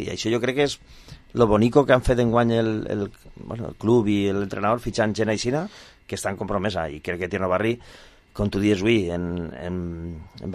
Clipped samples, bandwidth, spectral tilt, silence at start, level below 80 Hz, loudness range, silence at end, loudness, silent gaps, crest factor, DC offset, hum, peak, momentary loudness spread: under 0.1%; 14 kHz; -6 dB/octave; 0 s; -42 dBFS; 5 LU; 0 s; -23 LUFS; none; 20 dB; under 0.1%; none; -2 dBFS; 15 LU